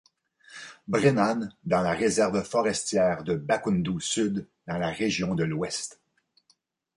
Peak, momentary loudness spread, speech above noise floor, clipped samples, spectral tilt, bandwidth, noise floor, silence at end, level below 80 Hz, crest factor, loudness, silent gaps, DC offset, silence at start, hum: -8 dBFS; 11 LU; 43 dB; under 0.1%; -5 dB/octave; 11.5 kHz; -69 dBFS; 1.05 s; -58 dBFS; 20 dB; -26 LUFS; none; under 0.1%; 0.5 s; none